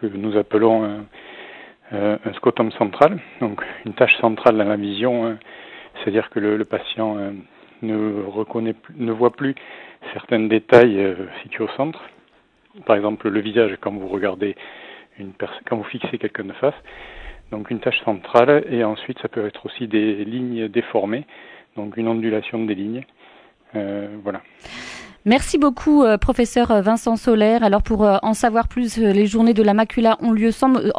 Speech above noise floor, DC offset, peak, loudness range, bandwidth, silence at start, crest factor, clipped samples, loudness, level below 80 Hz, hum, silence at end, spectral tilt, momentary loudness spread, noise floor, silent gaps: 38 dB; under 0.1%; 0 dBFS; 9 LU; 11 kHz; 0 s; 20 dB; under 0.1%; -19 LUFS; -40 dBFS; none; 0 s; -6 dB/octave; 19 LU; -57 dBFS; none